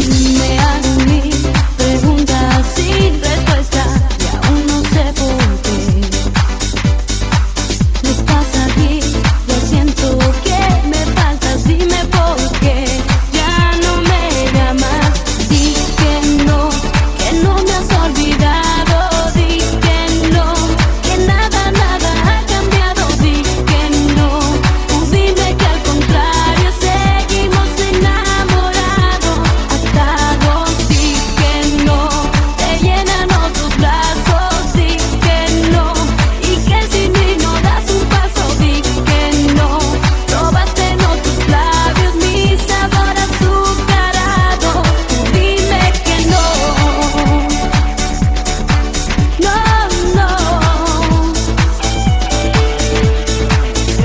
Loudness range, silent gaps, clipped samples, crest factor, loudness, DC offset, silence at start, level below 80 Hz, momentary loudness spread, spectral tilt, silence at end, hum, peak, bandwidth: 1 LU; none; under 0.1%; 12 dB; -13 LUFS; under 0.1%; 0 s; -16 dBFS; 3 LU; -4.5 dB/octave; 0 s; none; 0 dBFS; 8 kHz